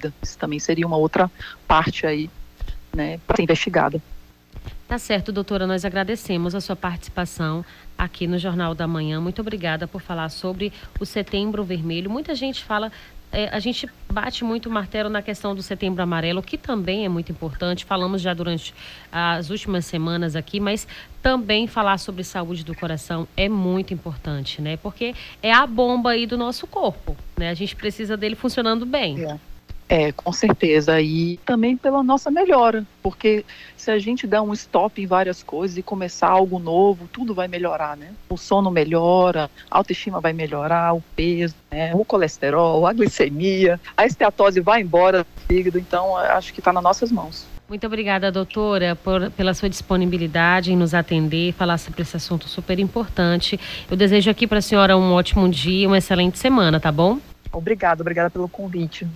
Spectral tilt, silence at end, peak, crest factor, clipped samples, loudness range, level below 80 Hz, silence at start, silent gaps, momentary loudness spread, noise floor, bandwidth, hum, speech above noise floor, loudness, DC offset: -5.5 dB/octave; 0 s; -2 dBFS; 20 dB; under 0.1%; 8 LU; -38 dBFS; 0 s; none; 12 LU; -41 dBFS; 16 kHz; none; 20 dB; -21 LUFS; under 0.1%